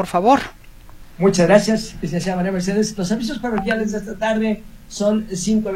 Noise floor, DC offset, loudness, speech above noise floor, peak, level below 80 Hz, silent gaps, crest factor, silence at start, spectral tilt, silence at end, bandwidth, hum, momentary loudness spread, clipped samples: -39 dBFS; under 0.1%; -19 LUFS; 21 dB; 0 dBFS; -40 dBFS; none; 18 dB; 0 s; -5.5 dB/octave; 0 s; 15.5 kHz; none; 9 LU; under 0.1%